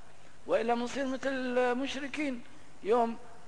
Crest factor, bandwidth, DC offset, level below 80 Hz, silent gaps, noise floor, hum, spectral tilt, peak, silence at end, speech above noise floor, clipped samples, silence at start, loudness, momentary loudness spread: 16 dB; 10.5 kHz; 0.8%; -64 dBFS; none; -51 dBFS; none; -4 dB/octave; -16 dBFS; 0.05 s; 19 dB; under 0.1%; 0.25 s; -32 LUFS; 8 LU